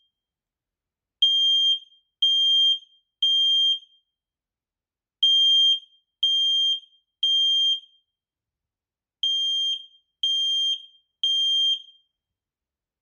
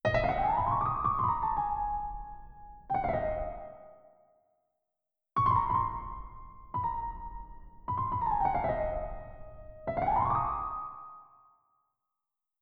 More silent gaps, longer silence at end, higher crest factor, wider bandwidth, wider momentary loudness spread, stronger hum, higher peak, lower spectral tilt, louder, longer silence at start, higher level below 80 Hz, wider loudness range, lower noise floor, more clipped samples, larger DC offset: neither; second, 1.2 s vs 1.4 s; about the same, 16 dB vs 18 dB; first, 16 kHz vs 6.6 kHz; second, 10 LU vs 21 LU; neither; first, -10 dBFS vs -16 dBFS; second, 8 dB/octave vs -8.5 dB/octave; first, -20 LUFS vs -31 LUFS; first, 1.2 s vs 0.05 s; second, under -90 dBFS vs -46 dBFS; about the same, 5 LU vs 4 LU; first, under -90 dBFS vs -86 dBFS; neither; neither